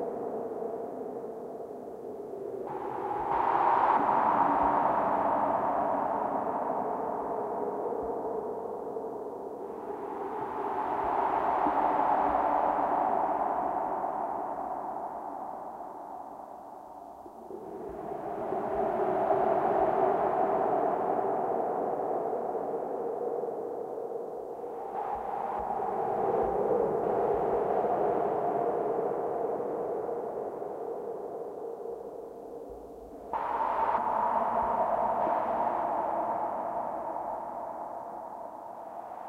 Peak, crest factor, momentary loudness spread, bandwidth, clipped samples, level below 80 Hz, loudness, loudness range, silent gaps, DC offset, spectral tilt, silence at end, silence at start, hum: -12 dBFS; 18 dB; 14 LU; 15.5 kHz; under 0.1%; -62 dBFS; -31 LUFS; 9 LU; none; under 0.1%; -7.5 dB/octave; 0 s; 0 s; none